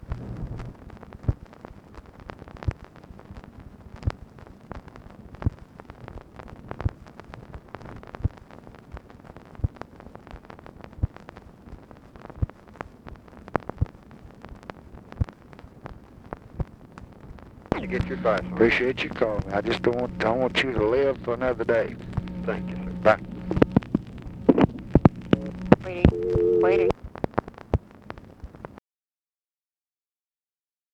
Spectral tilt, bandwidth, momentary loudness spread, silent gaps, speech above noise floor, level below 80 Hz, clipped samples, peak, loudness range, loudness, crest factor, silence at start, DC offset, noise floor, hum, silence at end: -8 dB/octave; 10 kHz; 25 LU; none; over 66 dB; -40 dBFS; under 0.1%; 0 dBFS; 15 LU; -26 LUFS; 28 dB; 0 s; under 0.1%; under -90 dBFS; none; 2.15 s